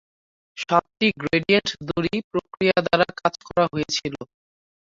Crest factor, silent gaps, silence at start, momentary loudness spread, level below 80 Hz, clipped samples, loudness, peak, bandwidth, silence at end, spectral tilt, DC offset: 20 dB; 2.24-2.31 s; 0.55 s; 14 LU; -56 dBFS; under 0.1%; -22 LUFS; -4 dBFS; 7.8 kHz; 0.7 s; -4.5 dB/octave; under 0.1%